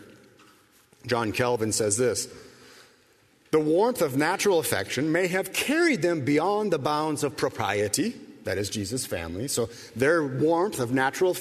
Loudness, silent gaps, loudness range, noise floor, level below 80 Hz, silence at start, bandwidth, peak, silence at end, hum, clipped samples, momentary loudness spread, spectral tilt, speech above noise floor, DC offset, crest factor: -25 LUFS; none; 4 LU; -61 dBFS; -60 dBFS; 0 s; 13.5 kHz; -8 dBFS; 0 s; none; under 0.1%; 7 LU; -4 dB/octave; 36 dB; under 0.1%; 18 dB